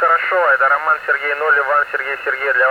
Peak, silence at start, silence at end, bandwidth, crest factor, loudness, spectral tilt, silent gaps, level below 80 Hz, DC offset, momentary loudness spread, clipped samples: -4 dBFS; 0 s; 0 s; 17.5 kHz; 12 dB; -15 LUFS; -2.5 dB/octave; none; -62 dBFS; under 0.1%; 6 LU; under 0.1%